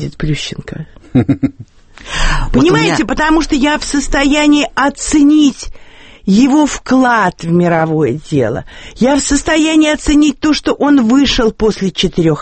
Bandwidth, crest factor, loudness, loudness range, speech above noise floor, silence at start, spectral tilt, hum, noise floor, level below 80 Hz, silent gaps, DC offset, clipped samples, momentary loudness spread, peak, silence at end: 8.8 kHz; 12 dB; -12 LUFS; 2 LU; 19 dB; 0 s; -5 dB/octave; none; -31 dBFS; -26 dBFS; none; under 0.1%; under 0.1%; 9 LU; 0 dBFS; 0 s